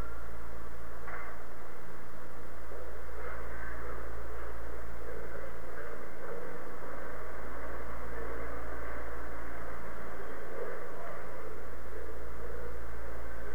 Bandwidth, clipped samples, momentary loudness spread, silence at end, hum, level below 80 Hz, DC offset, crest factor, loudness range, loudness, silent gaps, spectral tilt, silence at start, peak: over 20 kHz; under 0.1%; 5 LU; 0 s; none; -48 dBFS; 6%; 14 dB; 2 LU; -44 LUFS; none; -6.5 dB/octave; 0 s; -20 dBFS